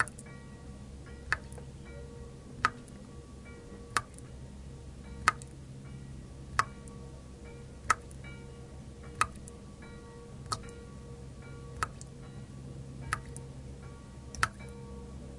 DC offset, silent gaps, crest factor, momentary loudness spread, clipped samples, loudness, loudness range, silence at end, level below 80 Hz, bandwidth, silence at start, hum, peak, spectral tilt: under 0.1%; none; 34 dB; 16 LU; under 0.1%; -39 LUFS; 6 LU; 0 s; -52 dBFS; 11.5 kHz; 0 s; none; -6 dBFS; -3.5 dB/octave